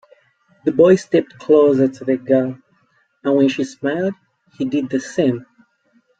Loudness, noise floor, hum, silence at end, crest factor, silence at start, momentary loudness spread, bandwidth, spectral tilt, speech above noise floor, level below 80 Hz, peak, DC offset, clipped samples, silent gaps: -17 LUFS; -61 dBFS; none; 0.75 s; 16 dB; 0.65 s; 13 LU; 8.8 kHz; -7 dB/octave; 45 dB; -62 dBFS; -2 dBFS; under 0.1%; under 0.1%; none